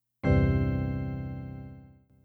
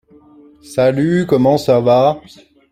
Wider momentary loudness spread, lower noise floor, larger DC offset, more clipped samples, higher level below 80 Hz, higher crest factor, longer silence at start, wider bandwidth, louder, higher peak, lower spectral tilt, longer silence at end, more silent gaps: first, 18 LU vs 7 LU; first, -53 dBFS vs -44 dBFS; neither; neither; first, -38 dBFS vs -52 dBFS; about the same, 16 dB vs 14 dB; second, 0.25 s vs 0.7 s; second, 4.7 kHz vs 14 kHz; second, -29 LUFS vs -14 LUFS; second, -12 dBFS vs -2 dBFS; first, -10 dB/octave vs -7 dB/octave; second, 0.4 s vs 0.55 s; neither